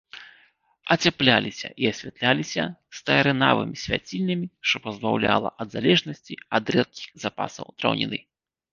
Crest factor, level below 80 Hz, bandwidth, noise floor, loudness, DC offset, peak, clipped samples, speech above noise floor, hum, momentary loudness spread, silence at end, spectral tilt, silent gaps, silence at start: 22 dB; -58 dBFS; 7.4 kHz; -61 dBFS; -24 LUFS; under 0.1%; -2 dBFS; under 0.1%; 37 dB; none; 13 LU; 0.5 s; -4.5 dB/octave; none; 0.15 s